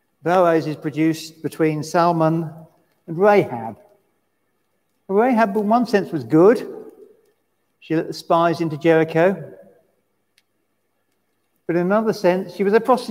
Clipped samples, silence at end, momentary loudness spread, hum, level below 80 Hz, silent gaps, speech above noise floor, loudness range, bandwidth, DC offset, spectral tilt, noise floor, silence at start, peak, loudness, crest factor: under 0.1%; 0 s; 15 LU; none; -72 dBFS; none; 53 dB; 4 LU; 16 kHz; under 0.1%; -7 dB/octave; -71 dBFS; 0.25 s; -2 dBFS; -19 LUFS; 18 dB